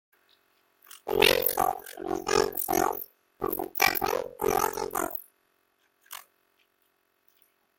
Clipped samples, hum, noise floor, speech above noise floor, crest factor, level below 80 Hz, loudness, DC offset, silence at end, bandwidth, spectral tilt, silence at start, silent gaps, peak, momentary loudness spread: under 0.1%; none; -72 dBFS; 45 dB; 26 dB; -56 dBFS; -27 LUFS; under 0.1%; 1.55 s; 17 kHz; -2.5 dB/octave; 0.95 s; none; -4 dBFS; 21 LU